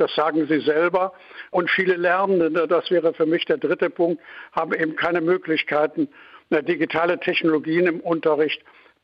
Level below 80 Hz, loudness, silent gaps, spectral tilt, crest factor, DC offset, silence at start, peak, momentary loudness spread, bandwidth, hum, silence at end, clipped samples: -68 dBFS; -21 LUFS; none; -7.5 dB/octave; 14 dB; under 0.1%; 0 s; -8 dBFS; 6 LU; 5.6 kHz; none; 0.45 s; under 0.1%